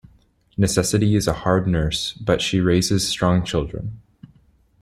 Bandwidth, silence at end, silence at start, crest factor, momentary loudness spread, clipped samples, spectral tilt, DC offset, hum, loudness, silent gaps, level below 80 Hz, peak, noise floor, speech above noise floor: 15.5 kHz; 0.85 s; 0.6 s; 18 dB; 8 LU; under 0.1%; -5 dB/octave; under 0.1%; none; -20 LUFS; none; -40 dBFS; -2 dBFS; -57 dBFS; 37 dB